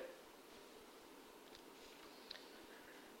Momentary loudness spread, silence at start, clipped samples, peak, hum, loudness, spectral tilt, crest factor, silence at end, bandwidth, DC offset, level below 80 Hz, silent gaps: 5 LU; 0 s; under 0.1%; -34 dBFS; none; -58 LUFS; -2 dB/octave; 24 dB; 0 s; 16 kHz; under 0.1%; -82 dBFS; none